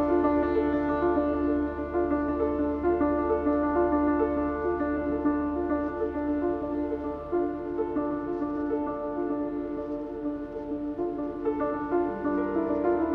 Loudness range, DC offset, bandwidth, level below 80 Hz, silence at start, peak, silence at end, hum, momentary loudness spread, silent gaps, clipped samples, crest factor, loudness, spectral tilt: 5 LU; under 0.1%; 4.4 kHz; -46 dBFS; 0 s; -12 dBFS; 0 s; none; 7 LU; none; under 0.1%; 16 dB; -28 LUFS; -10 dB/octave